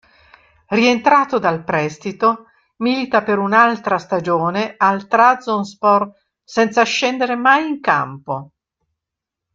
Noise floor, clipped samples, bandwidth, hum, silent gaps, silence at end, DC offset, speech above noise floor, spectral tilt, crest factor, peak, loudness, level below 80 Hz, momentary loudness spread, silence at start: -83 dBFS; under 0.1%; 7.6 kHz; none; none; 1.1 s; under 0.1%; 67 dB; -5 dB/octave; 16 dB; -2 dBFS; -16 LUFS; -62 dBFS; 10 LU; 0.7 s